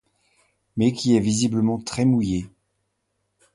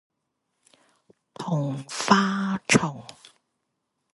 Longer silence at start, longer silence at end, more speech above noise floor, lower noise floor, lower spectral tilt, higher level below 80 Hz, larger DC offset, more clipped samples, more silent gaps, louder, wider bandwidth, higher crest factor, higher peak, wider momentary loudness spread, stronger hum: second, 0.75 s vs 1.4 s; about the same, 1.05 s vs 1 s; about the same, 54 dB vs 55 dB; second, -74 dBFS vs -79 dBFS; first, -6 dB/octave vs -4.5 dB/octave; first, -50 dBFS vs -60 dBFS; neither; neither; neither; about the same, -22 LUFS vs -24 LUFS; about the same, 11.5 kHz vs 11.5 kHz; second, 18 dB vs 26 dB; second, -6 dBFS vs 0 dBFS; second, 10 LU vs 17 LU; neither